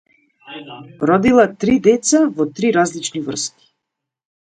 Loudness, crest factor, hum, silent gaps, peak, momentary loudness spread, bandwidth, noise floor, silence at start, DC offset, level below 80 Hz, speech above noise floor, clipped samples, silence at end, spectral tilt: -16 LUFS; 18 dB; none; none; 0 dBFS; 20 LU; 9.4 kHz; -80 dBFS; 0.5 s; under 0.1%; -50 dBFS; 64 dB; under 0.1%; 1 s; -4.5 dB/octave